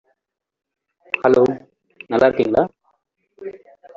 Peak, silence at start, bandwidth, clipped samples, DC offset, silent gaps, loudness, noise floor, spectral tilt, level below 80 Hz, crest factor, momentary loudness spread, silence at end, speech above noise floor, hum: -2 dBFS; 1.15 s; 7.4 kHz; under 0.1%; under 0.1%; none; -18 LUFS; -79 dBFS; -5 dB/octave; -56 dBFS; 18 dB; 21 LU; 0.4 s; 64 dB; none